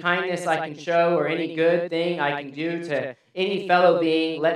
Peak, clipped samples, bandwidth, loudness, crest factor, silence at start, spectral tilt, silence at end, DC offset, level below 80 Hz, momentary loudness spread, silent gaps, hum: -4 dBFS; under 0.1%; 11.5 kHz; -23 LUFS; 18 dB; 0 s; -5.5 dB/octave; 0 s; under 0.1%; -80 dBFS; 10 LU; none; none